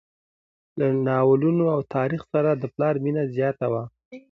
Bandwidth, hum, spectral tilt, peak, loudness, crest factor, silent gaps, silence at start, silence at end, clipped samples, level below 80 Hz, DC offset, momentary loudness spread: 5.8 kHz; none; -10.5 dB/octave; -8 dBFS; -23 LUFS; 16 dB; 4.05-4.11 s; 0.75 s; 0.15 s; under 0.1%; -64 dBFS; under 0.1%; 8 LU